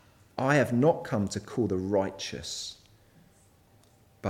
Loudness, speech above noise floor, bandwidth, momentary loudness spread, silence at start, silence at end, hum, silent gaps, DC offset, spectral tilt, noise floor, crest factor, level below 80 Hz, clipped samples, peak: -28 LUFS; 33 dB; 16 kHz; 12 LU; 0.35 s; 0 s; none; none; under 0.1%; -5.5 dB/octave; -61 dBFS; 20 dB; -62 dBFS; under 0.1%; -10 dBFS